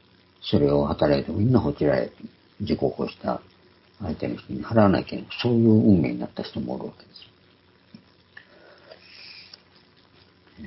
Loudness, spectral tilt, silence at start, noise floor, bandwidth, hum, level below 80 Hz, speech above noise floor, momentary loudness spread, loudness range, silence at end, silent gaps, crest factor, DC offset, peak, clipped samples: -23 LUFS; -11.5 dB/octave; 0.45 s; -58 dBFS; 5.8 kHz; none; -46 dBFS; 35 dB; 20 LU; 14 LU; 0 s; none; 20 dB; under 0.1%; -6 dBFS; under 0.1%